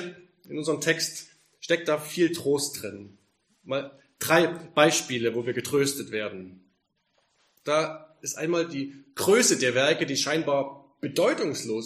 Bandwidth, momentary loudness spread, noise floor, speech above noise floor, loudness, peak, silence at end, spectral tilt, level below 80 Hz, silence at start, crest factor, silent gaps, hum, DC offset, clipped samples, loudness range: 15.5 kHz; 16 LU; -73 dBFS; 47 dB; -26 LUFS; -4 dBFS; 0 s; -3 dB/octave; -72 dBFS; 0 s; 24 dB; none; none; under 0.1%; under 0.1%; 5 LU